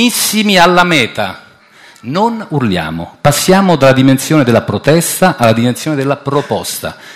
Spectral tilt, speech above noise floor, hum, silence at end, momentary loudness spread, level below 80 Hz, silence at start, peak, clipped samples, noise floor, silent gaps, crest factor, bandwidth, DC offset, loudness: -4.5 dB/octave; 30 dB; none; 0 s; 11 LU; -42 dBFS; 0 s; 0 dBFS; 0.6%; -41 dBFS; none; 12 dB; 16 kHz; under 0.1%; -11 LUFS